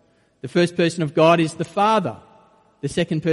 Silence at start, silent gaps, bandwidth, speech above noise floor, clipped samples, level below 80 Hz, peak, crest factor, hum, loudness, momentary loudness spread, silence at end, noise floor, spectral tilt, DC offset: 0.45 s; none; 11.5 kHz; 35 dB; under 0.1%; -56 dBFS; -2 dBFS; 18 dB; none; -20 LUFS; 13 LU; 0 s; -54 dBFS; -6 dB/octave; under 0.1%